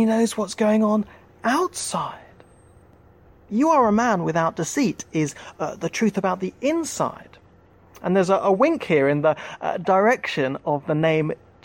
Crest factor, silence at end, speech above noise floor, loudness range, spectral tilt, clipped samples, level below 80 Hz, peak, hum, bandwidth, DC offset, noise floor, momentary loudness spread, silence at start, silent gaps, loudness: 16 dB; 0.3 s; 31 dB; 4 LU; -5.5 dB/octave; under 0.1%; -60 dBFS; -6 dBFS; none; 16.5 kHz; under 0.1%; -53 dBFS; 10 LU; 0 s; none; -22 LUFS